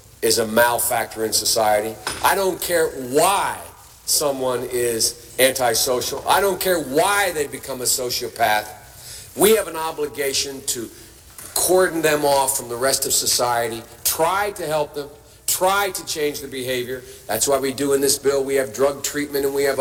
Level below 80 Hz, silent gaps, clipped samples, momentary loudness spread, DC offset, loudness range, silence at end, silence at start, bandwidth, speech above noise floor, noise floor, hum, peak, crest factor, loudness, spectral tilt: -50 dBFS; none; under 0.1%; 10 LU; under 0.1%; 3 LU; 0 s; 0.2 s; 18 kHz; 20 dB; -40 dBFS; none; -2 dBFS; 20 dB; -20 LUFS; -2 dB/octave